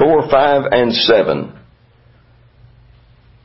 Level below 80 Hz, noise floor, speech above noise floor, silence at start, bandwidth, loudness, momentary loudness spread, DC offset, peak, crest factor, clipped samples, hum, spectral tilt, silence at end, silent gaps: -48 dBFS; -49 dBFS; 36 dB; 0 s; 5.8 kHz; -13 LUFS; 9 LU; under 0.1%; 0 dBFS; 16 dB; under 0.1%; none; -8.5 dB/octave; 1.95 s; none